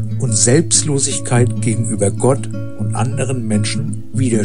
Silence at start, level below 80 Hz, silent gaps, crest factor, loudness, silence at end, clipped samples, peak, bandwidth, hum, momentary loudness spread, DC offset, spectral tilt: 0 s; -48 dBFS; none; 16 dB; -16 LUFS; 0 s; under 0.1%; 0 dBFS; 11.5 kHz; none; 10 LU; 5%; -4.5 dB/octave